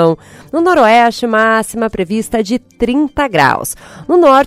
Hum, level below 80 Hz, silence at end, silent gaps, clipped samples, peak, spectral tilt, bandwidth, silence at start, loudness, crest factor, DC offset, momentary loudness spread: none; -40 dBFS; 0 s; none; 0.4%; 0 dBFS; -5 dB/octave; 16 kHz; 0 s; -12 LUFS; 12 dB; under 0.1%; 10 LU